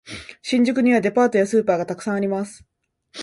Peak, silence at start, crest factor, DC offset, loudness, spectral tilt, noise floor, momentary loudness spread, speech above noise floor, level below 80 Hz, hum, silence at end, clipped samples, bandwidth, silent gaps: -6 dBFS; 0.05 s; 14 dB; under 0.1%; -20 LUFS; -5.5 dB/octave; -46 dBFS; 15 LU; 27 dB; -60 dBFS; none; 0 s; under 0.1%; 11.5 kHz; none